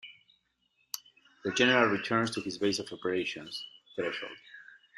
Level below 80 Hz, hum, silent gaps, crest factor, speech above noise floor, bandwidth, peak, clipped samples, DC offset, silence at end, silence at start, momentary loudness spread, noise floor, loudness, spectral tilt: -72 dBFS; none; none; 24 dB; 44 dB; 13.5 kHz; -8 dBFS; under 0.1%; under 0.1%; 0.35 s; 0.05 s; 19 LU; -74 dBFS; -30 LUFS; -3.5 dB/octave